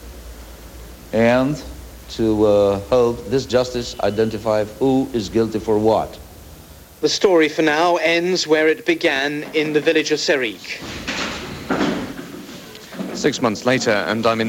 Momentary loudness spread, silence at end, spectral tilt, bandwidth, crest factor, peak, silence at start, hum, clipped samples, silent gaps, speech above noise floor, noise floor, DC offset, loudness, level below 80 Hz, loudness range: 19 LU; 0 s; -4.5 dB/octave; 17 kHz; 16 dB; -4 dBFS; 0 s; none; under 0.1%; none; 23 dB; -41 dBFS; under 0.1%; -19 LUFS; -44 dBFS; 5 LU